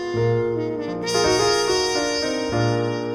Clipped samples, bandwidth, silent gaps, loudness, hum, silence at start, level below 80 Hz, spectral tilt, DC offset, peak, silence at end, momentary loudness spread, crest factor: under 0.1%; 17.5 kHz; none; -21 LUFS; none; 0 s; -46 dBFS; -4 dB/octave; under 0.1%; -8 dBFS; 0 s; 6 LU; 14 dB